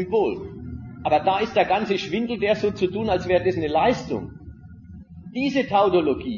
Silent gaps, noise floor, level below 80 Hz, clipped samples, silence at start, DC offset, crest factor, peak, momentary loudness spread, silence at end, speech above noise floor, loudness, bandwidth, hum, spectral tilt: none; -42 dBFS; -48 dBFS; under 0.1%; 0 s; under 0.1%; 16 dB; -6 dBFS; 17 LU; 0 s; 20 dB; -22 LUFS; 7.4 kHz; none; -6.5 dB/octave